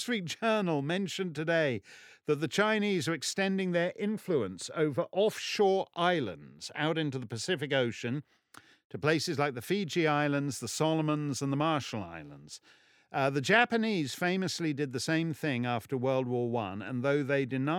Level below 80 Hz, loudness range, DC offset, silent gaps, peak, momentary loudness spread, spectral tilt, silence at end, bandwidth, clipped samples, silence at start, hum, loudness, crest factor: -76 dBFS; 3 LU; under 0.1%; 8.84-8.90 s; -10 dBFS; 9 LU; -5 dB/octave; 0 s; 18 kHz; under 0.1%; 0 s; none; -31 LUFS; 22 dB